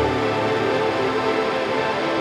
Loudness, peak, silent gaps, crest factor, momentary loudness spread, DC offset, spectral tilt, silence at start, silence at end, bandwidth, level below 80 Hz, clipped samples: -21 LUFS; -8 dBFS; none; 14 dB; 1 LU; under 0.1%; -5.5 dB/octave; 0 s; 0 s; 13 kHz; -46 dBFS; under 0.1%